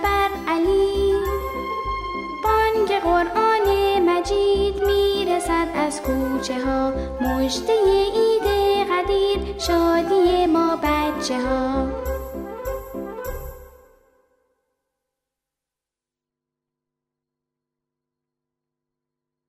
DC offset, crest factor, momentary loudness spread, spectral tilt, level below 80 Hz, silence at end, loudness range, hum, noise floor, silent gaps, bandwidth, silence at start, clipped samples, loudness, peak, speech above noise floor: under 0.1%; 14 dB; 11 LU; -5 dB/octave; -36 dBFS; 5.8 s; 13 LU; none; -88 dBFS; none; 15.5 kHz; 0 s; under 0.1%; -21 LUFS; -8 dBFS; 67 dB